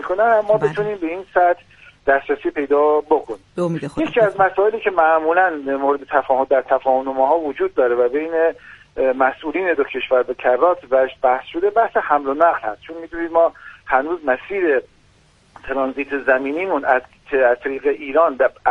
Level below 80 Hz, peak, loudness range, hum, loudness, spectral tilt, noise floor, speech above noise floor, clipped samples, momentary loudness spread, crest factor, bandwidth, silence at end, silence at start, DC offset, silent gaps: -52 dBFS; -2 dBFS; 3 LU; none; -18 LUFS; -7 dB/octave; -54 dBFS; 36 dB; under 0.1%; 7 LU; 18 dB; 7.4 kHz; 0 s; 0 s; under 0.1%; none